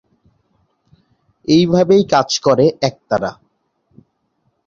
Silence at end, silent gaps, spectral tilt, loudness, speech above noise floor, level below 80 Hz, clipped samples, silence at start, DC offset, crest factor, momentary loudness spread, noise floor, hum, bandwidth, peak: 1.35 s; none; -5.5 dB/octave; -14 LUFS; 52 dB; -54 dBFS; under 0.1%; 1.5 s; under 0.1%; 16 dB; 9 LU; -66 dBFS; none; 7.6 kHz; -2 dBFS